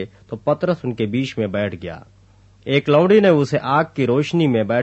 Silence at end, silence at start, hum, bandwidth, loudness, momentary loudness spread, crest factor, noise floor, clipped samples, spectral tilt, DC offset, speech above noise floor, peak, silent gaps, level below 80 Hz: 0 s; 0 s; none; 8.4 kHz; -18 LUFS; 17 LU; 16 dB; -50 dBFS; under 0.1%; -7.5 dB/octave; under 0.1%; 32 dB; -2 dBFS; none; -56 dBFS